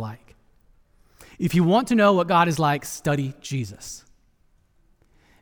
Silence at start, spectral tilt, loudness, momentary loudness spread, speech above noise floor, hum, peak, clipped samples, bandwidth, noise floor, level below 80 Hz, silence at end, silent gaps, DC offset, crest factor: 0 s; -6 dB/octave; -21 LUFS; 19 LU; 40 dB; none; -6 dBFS; under 0.1%; over 20 kHz; -61 dBFS; -54 dBFS; 1.45 s; none; under 0.1%; 18 dB